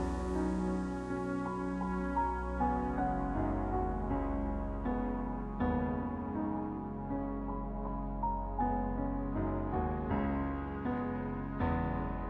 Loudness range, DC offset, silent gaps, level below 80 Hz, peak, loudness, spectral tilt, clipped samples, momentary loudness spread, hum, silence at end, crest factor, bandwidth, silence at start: 2 LU; under 0.1%; none; -42 dBFS; -20 dBFS; -36 LUFS; -9 dB/octave; under 0.1%; 4 LU; none; 0 s; 14 dB; 10 kHz; 0 s